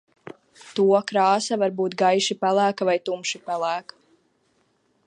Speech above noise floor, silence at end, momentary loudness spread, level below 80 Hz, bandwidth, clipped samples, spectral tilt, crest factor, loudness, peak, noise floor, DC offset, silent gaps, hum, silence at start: 45 dB; 1.25 s; 8 LU; -78 dBFS; 11 kHz; under 0.1%; -4 dB/octave; 18 dB; -22 LUFS; -6 dBFS; -67 dBFS; under 0.1%; none; none; 0.25 s